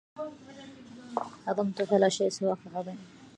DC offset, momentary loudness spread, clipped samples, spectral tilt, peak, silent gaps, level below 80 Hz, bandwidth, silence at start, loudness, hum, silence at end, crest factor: under 0.1%; 23 LU; under 0.1%; -5 dB/octave; -10 dBFS; none; -74 dBFS; 11 kHz; 0.15 s; -30 LUFS; none; 0.1 s; 20 dB